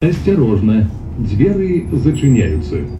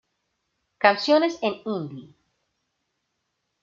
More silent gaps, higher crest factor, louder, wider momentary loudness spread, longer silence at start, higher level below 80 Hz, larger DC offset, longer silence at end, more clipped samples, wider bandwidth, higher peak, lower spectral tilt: neither; second, 14 dB vs 24 dB; first, -15 LUFS vs -22 LUFS; second, 7 LU vs 16 LU; second, 0 s vs 0.8 s; first, -28 dBFS vs -74 dBFS; neither; second, 0 s vs 1.6 s; neither; first, 11.5 kHz vs 7.4 kHz; about the same, 0 dBFS vs -2 dBFS; first, -8.5 dB/octave vs -5 dB/octave